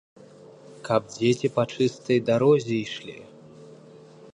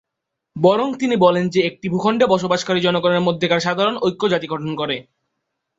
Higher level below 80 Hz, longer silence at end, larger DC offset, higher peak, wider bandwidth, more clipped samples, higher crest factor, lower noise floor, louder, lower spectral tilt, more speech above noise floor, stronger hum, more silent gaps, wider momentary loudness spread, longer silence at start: second, -66 dBFS vs -60 dBFS; second, 0.6 s vs 0.75 s; neither; second, -8 dBFS vs -2 dBFS; first, 10.5 kHz vs 8 kHz; neither; about the same, 18 dB vs 18 dB; second, -48 dBFS vs -80 dBFS; second, -24 LUFS vs -18 LUFS; about the same, -6 dB/octave vs -5.5 dB/octave; second, 25 dB vs 62 dB; neither; neither; first, 18 LU vs 8 LU; first, 0.7 s vs 0.55 s